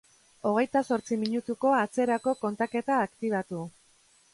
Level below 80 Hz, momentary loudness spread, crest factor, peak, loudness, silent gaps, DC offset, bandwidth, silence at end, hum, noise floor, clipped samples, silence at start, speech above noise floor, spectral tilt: -72 dBFS; 7 LU; 16 dB; -14 dBFS; -28 LUFS; none; under 0.1%; 11.5 kHz; 0.65 s; none; -63 dBFS; under 0.1%; 0.45 s; 35 dB; -5.5 dB/octave